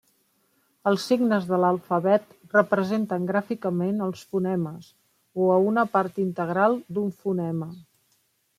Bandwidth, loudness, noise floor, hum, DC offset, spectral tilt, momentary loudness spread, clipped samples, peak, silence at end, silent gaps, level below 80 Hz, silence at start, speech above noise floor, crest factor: 15 kHz; -25 LUFS; -69 dBFS; none; under 0.1%; -7.5 dB/octave; 8 LU; under 0.1%; -4 dBFS; 0.75 s; none; -72 dBFS; 0.85 s; 45 dB; 20 dB